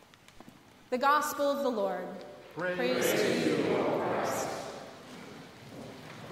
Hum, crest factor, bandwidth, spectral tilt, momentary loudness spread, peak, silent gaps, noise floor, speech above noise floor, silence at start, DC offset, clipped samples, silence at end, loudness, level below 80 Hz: none; 18 dB; 16 kHz; -4 dB/octave; 19 LU; -14 dBFS; none; -55 dBFS; 26 dB; 0.35 s; under 0.1%; under 0.1%; 0 s; -30 LUFS; -72 dBFS